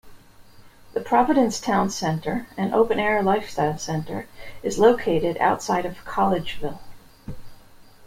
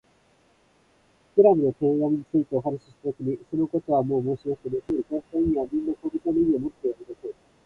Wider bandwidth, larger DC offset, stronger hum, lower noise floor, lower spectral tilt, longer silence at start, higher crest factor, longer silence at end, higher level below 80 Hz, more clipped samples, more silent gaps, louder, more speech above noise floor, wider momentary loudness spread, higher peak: first, 16.5 kHz vs 4.4 kHz; neither; neither; second, -47 dBFS vs -62 dBFS; second, -5.5 dB/octave vs -11 dB/octave; second, 0.05 s vs 1.35 s; about the same, 20 dB vs 20 dB; second, 0 s vs 0.35 s; first, -48 dBFS vs -54 dBFS; neither; neither; about the same, -23 LUFS vs -25 LUFS; second, 25 dB vs 38 dB; first, 16 LU vs 12 LU; about the same, -4 dBFS vs -6 dBFS